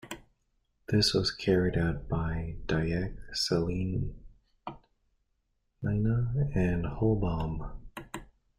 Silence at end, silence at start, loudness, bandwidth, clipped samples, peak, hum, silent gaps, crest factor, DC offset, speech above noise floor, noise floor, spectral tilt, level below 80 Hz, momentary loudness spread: 0.35 s; 0.05 s; -30 LUFS; 15.5 kHz; under 0.1%; -12 dBFS; none; none; 18 dB; under 0.1%; 47 dB; -76 dBFS; -6 dB/octave; -44 dBFS; 19 LU